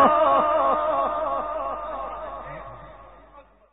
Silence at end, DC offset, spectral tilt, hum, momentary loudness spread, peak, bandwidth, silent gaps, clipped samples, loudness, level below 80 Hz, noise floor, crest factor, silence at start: 0.3 s; 0.2%; -3 dB/octave; none; 19 LU; -6 dBFS; 4 kHz; none; under 0.1%; -23 LUFS; -50 dBFS; -51 dBFS; 18 dB; 0 s